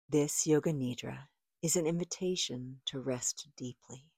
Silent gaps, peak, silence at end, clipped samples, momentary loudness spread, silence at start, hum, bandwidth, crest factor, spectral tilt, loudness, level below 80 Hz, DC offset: none; -18 dBFS; 0.2 s; under 0.1%; 15 LU; 0.1 s; none; 16 kHz; 16 dB; -4 dB/octave; -34 LUFS; -70 dBFS; under 0.1%